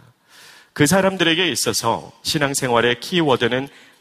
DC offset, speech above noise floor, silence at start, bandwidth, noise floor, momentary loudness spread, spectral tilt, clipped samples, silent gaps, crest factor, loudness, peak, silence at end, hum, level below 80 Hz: under 0.1%; 29 dB; 0.75 s; 15.5 kHz; -48 dBFS; 8 LU; -3.5 dB/octave; under 0.1%; none; 18 dB; -18 LUFS; 0 dBFS; 0.3 s; none; -52 dBFS